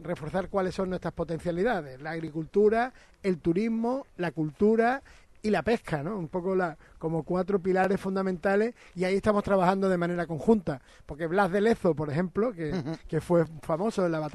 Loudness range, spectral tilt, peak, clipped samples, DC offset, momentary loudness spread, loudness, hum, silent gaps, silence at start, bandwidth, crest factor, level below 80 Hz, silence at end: 2 LU; -7.5 dB/octave; -8 dBFS; under 0.1%; under 0.1%; 9 LU; -28 LUFS; none; none; 0 s; 12.5 kHz; 18 dB; -52 dBFS; 0.05 s